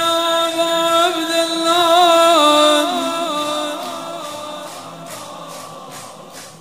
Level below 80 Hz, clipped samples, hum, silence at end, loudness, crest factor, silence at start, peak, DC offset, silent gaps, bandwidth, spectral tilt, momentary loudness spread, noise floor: -70 dBFS; under 0.1%; none; 0.05 s; -14 LUFS; 16 dB; 0 s; 0 dBFS; 0.2%; none; 16 kHz; -2 dB/octave; 22 LU; -36 dBFS